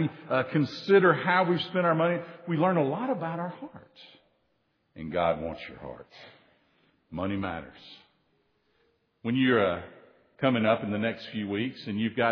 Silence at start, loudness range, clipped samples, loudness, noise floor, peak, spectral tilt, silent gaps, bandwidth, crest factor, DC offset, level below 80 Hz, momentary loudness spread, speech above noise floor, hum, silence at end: 0 s; 13 LU; under 0.1%; -27 LUFS; -73 dBFS; -8 dBFS; -8 dB/octave; none; 5.4 kHz; 20 dB; under 0.1%; -64 dBFS; 19 LU; 46 dB; none; 0 s